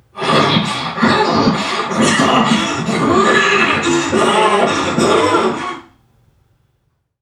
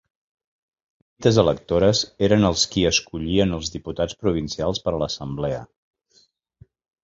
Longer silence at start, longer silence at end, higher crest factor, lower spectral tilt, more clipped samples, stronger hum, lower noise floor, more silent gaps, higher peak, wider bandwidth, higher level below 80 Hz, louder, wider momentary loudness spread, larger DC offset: second, 0.15 s vs 1.2 s; about the same, 1.4 s vs 1.4 s; second, 14 dB vs 20 dB; about the same, -4 dB/octave vs -5 dB/octave; neither; neither; about the same, -64 dBFS vs -61 dBFS; neither; about the same, 0 dBFS vs -2 dBFS; first, 13 kHz vs 7.8 kHz; second, -48 dBFS vs -42 dBFS; first, -13 LUFS vs -21 LUFS; second, 6 LU vs 9 LU; neither